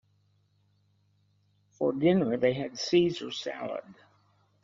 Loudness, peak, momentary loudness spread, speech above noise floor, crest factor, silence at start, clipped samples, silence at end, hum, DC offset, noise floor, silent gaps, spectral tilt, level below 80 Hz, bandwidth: -28 LUFS; -12 dBFS; 12 LU; 41 dB; 18 dB; 1.8 s; under 0.1%; 0.7 s; 50 Hz at -60 dBFS; under 0.1%; -69 dBFS; none; -5 dB/octave; -68 dBFS; 7.4 kHz